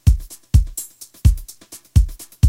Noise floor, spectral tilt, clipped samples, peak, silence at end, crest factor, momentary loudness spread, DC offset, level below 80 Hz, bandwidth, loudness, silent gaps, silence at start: -42 dBFS; -6 dB/octave; under 0.1%; 0 dBFS; 0 s; 16 dB; 16 LU; under 0.1%; -20 dBFS; 16.5 kHz; -20 LUFS; none; 0.05 s